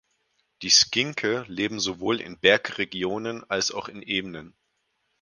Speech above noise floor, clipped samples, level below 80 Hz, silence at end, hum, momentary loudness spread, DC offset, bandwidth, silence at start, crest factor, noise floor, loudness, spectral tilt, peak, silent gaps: 49 dB; under 0.1%; -62 dBFS; 0.75 s; none; 14 LU; under 0.1%; 11 kHz; 0.6 s; 24 dB; -74 dBFS; -24 LUFS; -2 dB/octave; -4 dBFS; none